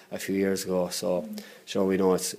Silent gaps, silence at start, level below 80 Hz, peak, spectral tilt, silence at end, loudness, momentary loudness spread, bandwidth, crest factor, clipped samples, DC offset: none; 0 s; -68 dBFS; -12 dBFS; -4.5 dB/octave; 0 s; -27 LUFS; 10 LU; 15.5 kHz; 16 dB; under 0.1%; under 0.1%